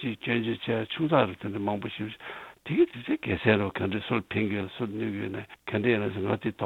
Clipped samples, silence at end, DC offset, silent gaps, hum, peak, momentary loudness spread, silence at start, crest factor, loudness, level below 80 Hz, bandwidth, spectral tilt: under 0.1%; 0 s; under 0.1%; none; none; -6 dBFS; 11 LU; 0 s; 22 dB; -29 LUFS; -60 dBFS; 4.4 kHz; -8 dB/octave